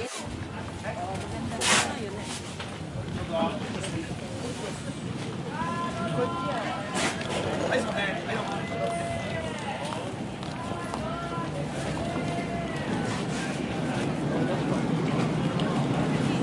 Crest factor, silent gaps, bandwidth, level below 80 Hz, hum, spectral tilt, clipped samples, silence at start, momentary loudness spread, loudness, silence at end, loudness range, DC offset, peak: 22 dB; none; 11.5 kHz; -52 dBFS; none; -4.5 dB/octave; under 0.1%; 0 s; 8 LU; -30 LUFS; 0 s; 4 LU; under 0.1%; -8 dBFS